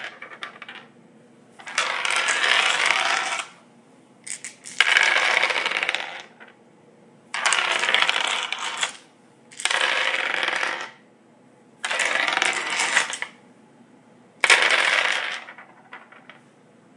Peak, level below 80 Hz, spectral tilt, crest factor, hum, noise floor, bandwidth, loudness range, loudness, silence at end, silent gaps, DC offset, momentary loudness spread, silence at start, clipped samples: 0 dBFS; -78 dBFS; 1 dB/octave; 26 dB; none; -54 dBFS; 11.5 kHz; 4 LU; -21 LUFS; 1 s; none; under 0.1%; 19 LU; 0 s; under 0.1%